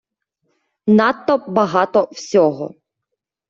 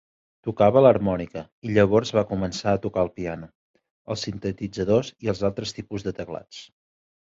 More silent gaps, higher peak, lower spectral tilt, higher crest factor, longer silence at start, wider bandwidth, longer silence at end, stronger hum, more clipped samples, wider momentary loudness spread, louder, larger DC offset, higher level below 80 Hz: second, none vs 1.52-1.62 s, 3.55-3.74 s, 3.91-4.05 s; about the same, -2 dBFS vs -4 dBFS; about the same, -6 dB/octave vs -6.5 dB/octave; about the same, 16 dB vs 20 dB; first, 0.85 s vs 0.45 s; about the same, 7.4 kHz vs 7.8 kHz; about the same, 0.8 s vs 0.7 s; neither; neither; second, 11 LU vs 17 LU; first, -16 LUFS vs -23 LUFS; neither; second, -64 dBFS vs -50 dBFS